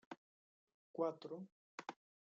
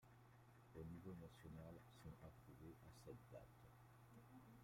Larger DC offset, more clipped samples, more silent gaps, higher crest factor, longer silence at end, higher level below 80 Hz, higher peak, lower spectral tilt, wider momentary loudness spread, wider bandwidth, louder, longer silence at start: neither; neither; first, 0.17-0.67 s, 0.74-0.94 s, 1.52-1.78 s vs none; about the same, 22 dB vs 18 dB; first, 0.35 s vs 0 s; second, under -90 dBFS vs -76 dBFS; first, -28 dBFS vs -44 dBFS; second, -5 dB/octave vs -7 dB/octave; first, 15 LU vs 10 LU; second, 7.4 kHz vs 16 kHz; first, -48 LUFS vs -63 LUFS; about the same, 0.1 s vs 0 s